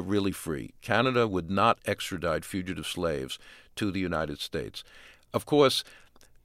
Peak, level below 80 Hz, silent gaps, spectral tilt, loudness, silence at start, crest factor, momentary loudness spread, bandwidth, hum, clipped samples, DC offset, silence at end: -8 dBFS; -54 dBFS; none; -5 dB/octave; -29 LUFS; 0 s; 22 dB; 13 LU; 16.5 kHz; none; under 0.1%; under 0.1%; 0.45 s